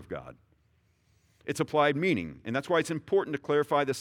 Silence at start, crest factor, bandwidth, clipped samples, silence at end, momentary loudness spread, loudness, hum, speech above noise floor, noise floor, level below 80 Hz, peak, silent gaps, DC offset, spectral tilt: 0 s; 18 dB; 15 kHz; under 0.1%; 0 s; 13 LU; -28 LUFS; none; 40 dB; -69 dBFS; -66 dBFS; -12 dBFS; none; under 0.1%; -5.5 dB/octave